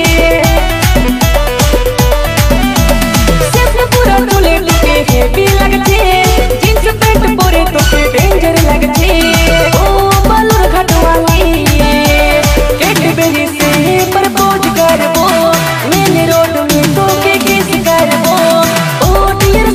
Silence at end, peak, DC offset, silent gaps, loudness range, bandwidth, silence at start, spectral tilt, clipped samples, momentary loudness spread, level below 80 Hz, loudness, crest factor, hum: 0 s; 0 dBFS; under 0.1%; none; 1 LU; 16 kHz; 0 s; -4.5 dB/octave; under 0.1%; 2 LU; -14 dBFS; -9 LUFS; 8 dB; none